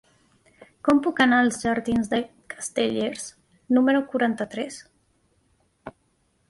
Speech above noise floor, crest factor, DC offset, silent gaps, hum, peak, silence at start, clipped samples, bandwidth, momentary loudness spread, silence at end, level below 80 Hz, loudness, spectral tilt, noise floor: 45 dB; 18 dB; under 0.1%; none; none; -6 dBFS; 0.85 s; under 0.1%; 11.5 kHz; 21 LU; 0.6 s; -58 dBFS; -23 LUFS; -4 dB/octave; -68 dBFS